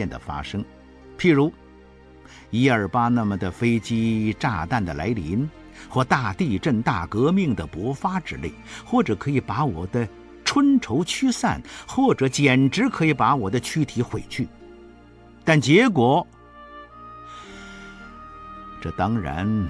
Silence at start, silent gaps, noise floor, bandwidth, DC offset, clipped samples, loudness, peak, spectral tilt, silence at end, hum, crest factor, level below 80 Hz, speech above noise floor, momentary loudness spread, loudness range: 0 s; none; -48 dBFS; 11 kHz; under 0.1%; under 0.1%; -22 LUFS; -4 dBFS; -6 dB/octave; 0 s; none; 20 dB; -46 dBFS; 26 dB; 21 LU; 3 LU